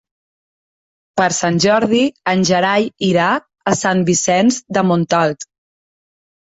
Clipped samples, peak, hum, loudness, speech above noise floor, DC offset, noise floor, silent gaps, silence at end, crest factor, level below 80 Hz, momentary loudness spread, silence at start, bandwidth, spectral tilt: under 0.1%; -2 dBFS; none; -15 LUFS; over 75 dB; under 0.1%; under -90 dBFS; none; 1 s; 16 dB; -56 dBFS; 6 LU; 1.15 s; 8 kHz; -4.5 dB/octave